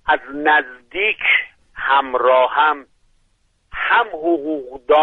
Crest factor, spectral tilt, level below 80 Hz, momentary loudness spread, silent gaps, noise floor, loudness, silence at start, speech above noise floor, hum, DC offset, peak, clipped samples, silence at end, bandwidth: 16 dB; -5 dB/octave; -52 dBFS; 13 LU; none; -61 dBFS; -17 LUFS; 0.05 s; 45 dB; none; under 0.1%; -2 dBFS; under 0.1%; 0 s; 4.2 kHz